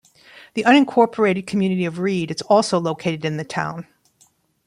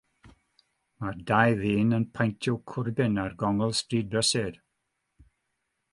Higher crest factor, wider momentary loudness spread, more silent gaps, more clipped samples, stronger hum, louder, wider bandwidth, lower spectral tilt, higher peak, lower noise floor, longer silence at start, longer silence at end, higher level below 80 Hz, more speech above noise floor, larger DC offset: about the same, 18 dB vs 22 dB; about the same, 11 LU vs 10 LU; neither; neither; neither; first, -19 LUFS vs -27 LUFS; about the same, 11.5 kHz vs 11.5 kHz; about the same, -5.5 dB/octave vs -5 dB/octave; first, -2 dBFS vs -6 dBFS; second, -59 dBFS vs -80 dBFS; first, 0.55 s vs 0.25 s; second, 0.85 s vs 1.35 s; second, -62 dBFS vs -56 dBFS; second, 40 dB vs 53 dB; neither